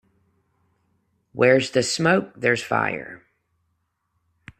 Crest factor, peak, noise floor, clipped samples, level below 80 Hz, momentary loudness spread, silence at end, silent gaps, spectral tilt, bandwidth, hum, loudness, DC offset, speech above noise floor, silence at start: 22 dB; -4 dBFS; -73 dBFS; under 0.1%; -64 dBFS; 15 LU; 1.45 s; none; -4.5 dB/octave; 14 kHz; none; -21 LUFS; under 0.1%; 52 dB; 1.35 s